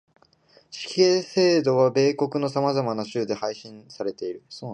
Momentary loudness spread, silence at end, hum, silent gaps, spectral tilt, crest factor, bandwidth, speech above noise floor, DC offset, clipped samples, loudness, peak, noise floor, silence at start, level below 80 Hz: 16 LU; 0 s; none; none; -5.5 dB/octave; 18 dB; 9.6 kHz; 35 dB; under 0.1%; under 0.1%; -23 LUFS; -6 dBFS; -58 dBFS; 0.7 s; -72 dBFS